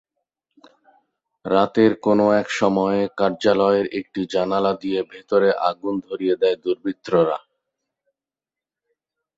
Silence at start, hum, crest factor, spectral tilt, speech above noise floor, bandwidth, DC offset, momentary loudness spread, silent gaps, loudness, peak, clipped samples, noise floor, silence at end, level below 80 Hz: 1.45 s; none; 18 dB; -6 dB/octave; 70 dB; 8 kHz; under 0.1%; 9 LU; none; -20 LUFS; -2 dBFS; under 0.1%; -90 dBFS; 2 s; -60 dBFS